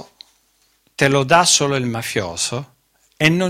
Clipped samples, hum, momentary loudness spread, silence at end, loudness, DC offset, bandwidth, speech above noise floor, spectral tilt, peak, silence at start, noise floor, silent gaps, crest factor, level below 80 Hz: under 0.1%; none; 11 LU; 0 s; -17 LUFS; under 0.1%; 16.5 kHz; 44 dB; -3.5 dB/octave; 0 dBFS; 0 s; -61 dBFS; none; 20 dB; -52 dBFS